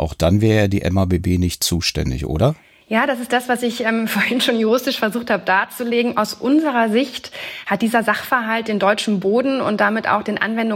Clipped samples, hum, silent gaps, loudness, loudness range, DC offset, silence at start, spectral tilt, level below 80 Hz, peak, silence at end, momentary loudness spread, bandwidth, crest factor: under 0.1%; none; none; -18 LUFS; 1 LU; under 0.1%; 0 s; -5 dB/octave; -40 dBFS; -4 dBFS; 0 s; 4 LU; 16.5 kHz; 16 dB